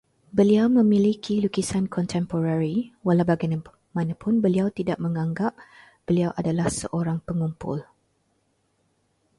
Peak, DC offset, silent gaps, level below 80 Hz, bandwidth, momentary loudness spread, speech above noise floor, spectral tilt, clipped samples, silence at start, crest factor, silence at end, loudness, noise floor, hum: -8 dBFS; under 0.1%; none; -54 dBFS; 11.5 kHz; 10 LU; 47 dB; -7 dB/octave; under 0.1%; 0.35 s; 16 dB; 1.55 s; -24 LUFS; -69 dBFS; none